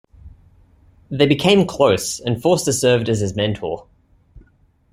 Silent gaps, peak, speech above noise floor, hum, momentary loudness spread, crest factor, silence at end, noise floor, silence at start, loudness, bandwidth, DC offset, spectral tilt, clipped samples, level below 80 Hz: none; 0 dBFS; 39 dB; none; 12 LU; 18 dB; 0.55 s; -56 dBFS; 0.25 s; -17 LUFS; 16 kHz; under 0.1%; -4.5 dB/octave; under 0.1%; -48 dBFS